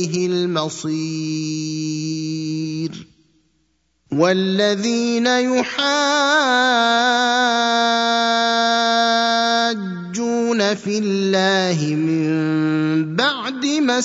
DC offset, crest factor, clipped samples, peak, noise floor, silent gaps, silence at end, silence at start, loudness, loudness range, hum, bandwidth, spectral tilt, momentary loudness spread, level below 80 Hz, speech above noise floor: under 0.1%; 16 dB; under 0.1%; -2 dBFS; -66 dBFS; none; 0 s; 0 s; -18 LUFS; 8 LU; none; 8 kHz; -4 dB/octave; 9 LU; -66 dBFS; 48 dB